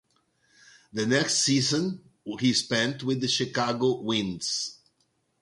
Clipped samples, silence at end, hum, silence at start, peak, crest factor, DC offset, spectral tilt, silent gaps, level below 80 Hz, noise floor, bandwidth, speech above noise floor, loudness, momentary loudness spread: under 0.1%; 0.7 s; none; 0.95 s; -8 dBFS; 20 dB; under 0.1%; -3.5 dB/octave; none; -64 dBFS; -72 dBFS; 11.5 kHz; 46 dB; -26 LUFS; 11 LU